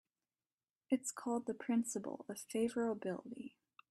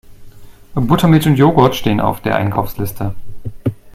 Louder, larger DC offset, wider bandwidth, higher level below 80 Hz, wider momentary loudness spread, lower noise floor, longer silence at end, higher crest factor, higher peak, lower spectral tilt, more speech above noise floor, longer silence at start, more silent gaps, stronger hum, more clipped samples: second, -40 LUFS vs -15 LUFS; neither; second, 13 kHz vs 16 kHz; second, -82 dBFS vs -36 dBFS; second, 11 LU vs 14 LU; first, under -90 dBFS vs -35 dBFS; first, 0.4 s vs 0.05 s; about the same, 18 dB vs 14 dB; second, -22 dBFS vs 0 dBFS; second, -4.5 dB/octave vs -7 dB/octave; first, over 51 dB vs 22 dB; first, 0.9 s vs 0.1 s; neither; neither; neither